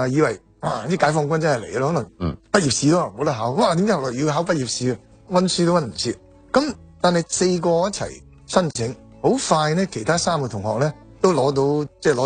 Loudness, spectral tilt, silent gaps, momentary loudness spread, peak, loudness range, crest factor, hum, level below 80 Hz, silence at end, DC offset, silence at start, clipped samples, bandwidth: -21 LUFS; -5 dB/octave; none; 8 LU; -2 dBFS; 2 LU; 18 dB; none; -50 dBFS; 0 s; under 0.1%; 0 s; under 0.1%; 9.6 kHz